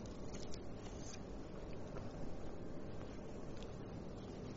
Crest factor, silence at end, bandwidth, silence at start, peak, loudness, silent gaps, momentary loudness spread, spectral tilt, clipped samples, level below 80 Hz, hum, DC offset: 16 dB; 0 s; 7.6 kHz; 0 s; -30 dBFS; -50 LUFS; none; 1 LU; -6.5 dB/octave; under 0.1%; -56 dBFS; none; under 0.1%